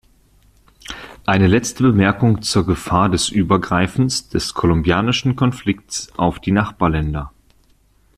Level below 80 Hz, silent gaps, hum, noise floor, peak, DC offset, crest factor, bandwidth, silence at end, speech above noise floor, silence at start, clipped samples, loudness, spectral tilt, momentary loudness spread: -36 dBFS; none; none; -55 dBFS; -2 dBFS; under 0.1%; 16 dB; 14 kHz; 0.9 s; 39 dB; 0.9 s; under 0.1%; -17 LUFS; -5.5 dB/octave; 10 LU